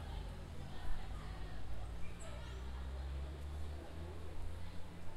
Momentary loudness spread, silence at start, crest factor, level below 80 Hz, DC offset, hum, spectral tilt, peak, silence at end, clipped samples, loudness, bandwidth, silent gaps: 4 LU; 0 s; 16 dB; -48 dBFS; under 0.1%; none; -6 dB/octave; -26 dBFS; 0 s; under 0.1%; -49 LUFS; 12.5 kHz; none